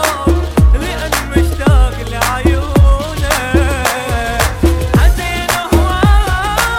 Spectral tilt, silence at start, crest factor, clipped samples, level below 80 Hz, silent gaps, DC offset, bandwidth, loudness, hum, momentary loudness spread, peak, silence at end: -5 dB/octave; 0 s; 12 dB; under 0.1%; -14 dBFS; none; under 0.1%; 17 kHz; -13 LUFS; none; 5 LU; 0 dBFS; 0 s